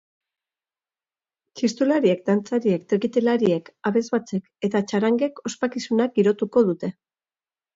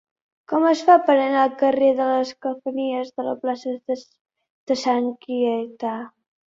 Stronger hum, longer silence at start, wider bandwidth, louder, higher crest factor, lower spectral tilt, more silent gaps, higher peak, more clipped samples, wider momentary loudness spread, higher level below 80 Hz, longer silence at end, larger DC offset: neither; first, 1.55 s vs 0.5 s; about the same, 7.8 kHz vs 7.8 kHz; about the same, -22 LUFS vs -21 LUFS; about the same, 18 dB vs 20 dB; first, -6 dB/octave vs -4.5 dB/octave; second, none vs 4.21-4.25 s, 4.50-4.67 s; second, -6 dBFS vs -2 dBFS; neither; second, 7 LU vs 13 LU; about the same, -70 dBFS vs -70 dBFS; first, 0.85 s vs 0.4 s; neither